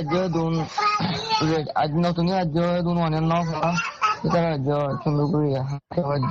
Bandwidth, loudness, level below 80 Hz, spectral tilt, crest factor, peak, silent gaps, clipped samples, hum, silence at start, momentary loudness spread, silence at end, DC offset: 7.4 kHz; -23 LUFS; -48 dBFS; -6.5 dB/octave; 12 dB; -10 dBFS; none; under 0.1%; none; 0 s; 2 LU; 0 s; under 0.1%